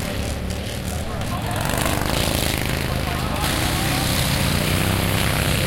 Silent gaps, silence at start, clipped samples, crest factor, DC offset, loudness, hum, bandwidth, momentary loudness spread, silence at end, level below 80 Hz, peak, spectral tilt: none; 0 s; under 0.1%; 18 dB; under 0.1%; -21 LUFS; none; 17 kHz; 7 LU; 0 s; -30 dBFS; -4 dBFS; -4 dB/octave